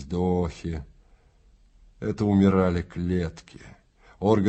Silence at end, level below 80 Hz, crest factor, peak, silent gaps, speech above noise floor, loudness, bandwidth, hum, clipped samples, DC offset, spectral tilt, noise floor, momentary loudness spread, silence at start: 0 s; -48 dBFS; 20 dB; -6 dBFS; none; 34 dB; -25 LUFS; 8.2 kHz; none; under 0.1%; under 0.1%; -8.5 dB/octave; -58 dBFS; 14 LU; 0 s